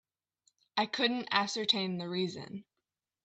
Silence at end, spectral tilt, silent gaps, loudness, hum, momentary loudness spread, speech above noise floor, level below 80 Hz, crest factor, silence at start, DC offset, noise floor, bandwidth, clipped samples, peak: 0.6 s; -4 dB/octave; none; -32 LUFS; none; 14 LU; 56 dB; -80 dBFS; 22 dB; 0.75 s; under 0.1%; -89 dBFS; 8.8 kHz; under 0.1%; -14 dBFS